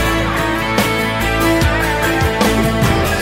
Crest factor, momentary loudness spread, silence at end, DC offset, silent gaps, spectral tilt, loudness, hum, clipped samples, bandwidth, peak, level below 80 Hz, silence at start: 14 dB; 2 LU; 0 s; under 0.1%; none; -5 dB/octave; -15 LUFS; none; under 0.1%; 16.5 kHz; -2 dBFS; -24 dBFS; 0 s